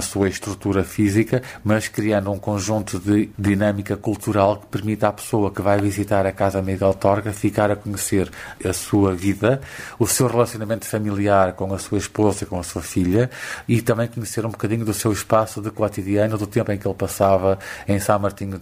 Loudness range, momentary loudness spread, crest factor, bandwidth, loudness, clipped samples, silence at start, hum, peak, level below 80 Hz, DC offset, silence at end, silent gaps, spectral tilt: 2 LU; 7 LU; 20 dB; 16 kHz; -21 LUFS; under 0.1%; 0 s; none; 0 dBFS; -48 dBFS; under 0.1%; 0 s; none; -6 dB/octave